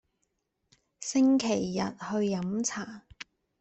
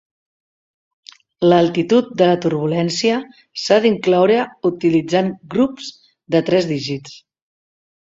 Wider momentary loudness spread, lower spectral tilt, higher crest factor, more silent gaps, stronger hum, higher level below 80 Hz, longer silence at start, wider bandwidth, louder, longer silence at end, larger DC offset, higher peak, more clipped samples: first, 22 LU vs 10 LU; second, -4.5 dB/octave vs -6 dB/octave; about the same, 16 dB vs 18 dB; neither; neither; second, -66 dBFS vs -60 dBFS; second, 1 s vs 1.4 s; about the same, 8.4 kHz vs 7.8 kHz; second, -29 LUFS vs -17 LUFS; second, 0.4 s vs 1 s; neither; second, -16 dBFS vs -2 dBFS; neither